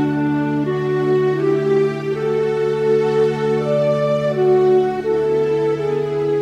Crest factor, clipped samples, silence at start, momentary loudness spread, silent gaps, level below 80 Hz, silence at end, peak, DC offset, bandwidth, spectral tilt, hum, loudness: 10 dB; under 0.1%; 0 s; 4 LU; none; -52 dBFS; 0 s; -6 dBFS; under 0.1%; 9 kHz; -8 dB/octave; none; -18 LUFS